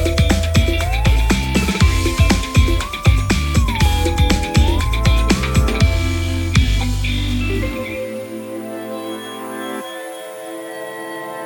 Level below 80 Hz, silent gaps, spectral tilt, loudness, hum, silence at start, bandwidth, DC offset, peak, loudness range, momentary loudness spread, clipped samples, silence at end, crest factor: -20 dBFS; none; -5 dB/octave; -18 LUFS; none; 0 s; 19.5 kHz; under 0.1%; 0 dBFS; 10 LU; 13 LU; under 0.1%; 0 s; 16 dB